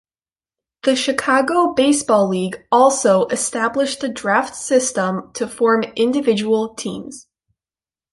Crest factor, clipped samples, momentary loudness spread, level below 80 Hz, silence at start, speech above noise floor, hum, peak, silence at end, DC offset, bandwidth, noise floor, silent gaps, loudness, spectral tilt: 16 dB; under 0.1%; 9 LU; -60 dBFS; 0.85 s; over 73 dB; none; -2 dBFS; 0.9 s; under 0.1%; 11.5 kHz; under -90 dBFS; none; -17 LUFS; -3.5 dB/octave